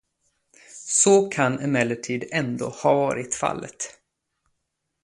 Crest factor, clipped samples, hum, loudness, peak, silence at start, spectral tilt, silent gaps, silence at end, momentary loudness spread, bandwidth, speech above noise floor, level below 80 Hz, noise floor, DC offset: 20 dB; under 0.1%; none; -22 LUFS; -6 dBFS; 0.7 s; -4 dB/octave; none; 1.1 s; 16 LU; 11.5 kHz; 56 dB; -64 dBFS; -78 dBFS; under 0.1%